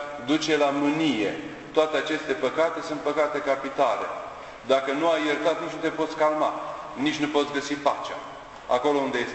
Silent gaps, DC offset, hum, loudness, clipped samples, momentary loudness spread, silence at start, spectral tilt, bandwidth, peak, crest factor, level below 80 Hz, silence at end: none; under 0.1%; none; -25 LUFS; under 0.1%; 11 LU; 0 s; -4 dB/octave; 8.4 kHz; -6 dBFS; 20 dB; -60 dBFS; 0 s